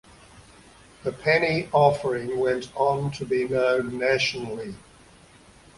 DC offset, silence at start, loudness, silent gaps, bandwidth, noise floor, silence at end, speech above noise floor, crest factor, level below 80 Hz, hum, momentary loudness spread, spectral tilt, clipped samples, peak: under 0.1%; 0.35 s; -24 LUFS; none; 11.5 kHz; -52 dBFS; 1 s; 28 dB; 20 dB; -56 dBFS; none; 13 LU; -5.5 dB/octave; under 0.1%; -6 dBFS